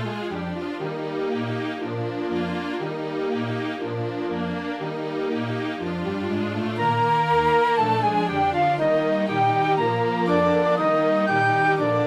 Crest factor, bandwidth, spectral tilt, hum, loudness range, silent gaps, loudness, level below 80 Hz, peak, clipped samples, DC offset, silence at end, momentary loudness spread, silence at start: 14 dB; 12.5 kHz; -7 dB/octave; none; 7 LU; none; -23 LUFS; -56 dBFS; -8 dBFS; under 0.1%; under 0.1%; 0 s; 9 LU; 0 s